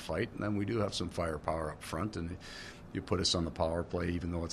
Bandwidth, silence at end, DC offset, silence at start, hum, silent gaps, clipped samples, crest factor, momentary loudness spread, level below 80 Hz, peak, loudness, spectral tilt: 13 kHz; 0 s; under 0.1%; 0 s; none; none; under 0.1%; 20 dB; 11 LU; -50 dBFS; -16 dBFS; -35 LUFS; -5 dB/octave